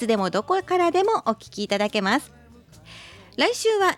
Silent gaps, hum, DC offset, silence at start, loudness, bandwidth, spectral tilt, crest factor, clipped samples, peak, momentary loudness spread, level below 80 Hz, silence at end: none; none; under 0.1%; 0 s; -23 LUFS; 15.5 kHz; -4 dB/octave; 16 dB; under 0.1%; -8 dBFS; 16 LU; -60 dBFS; 0 s